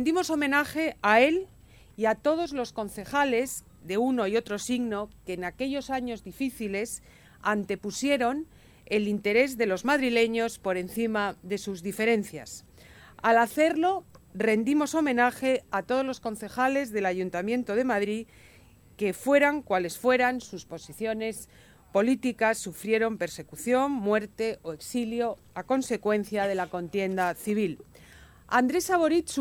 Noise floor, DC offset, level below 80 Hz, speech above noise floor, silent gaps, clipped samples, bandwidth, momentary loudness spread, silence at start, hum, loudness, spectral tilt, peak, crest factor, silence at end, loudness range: -52 dBFS; under 0.1%; -60 dBFS; 25 dB; none; under 0.1%; 19 kHz; 11 LU; 0 s; none; -27 LUFS; -4.5 dB/octave; -6 dBFS; 20 dB; 0 s; 4 LU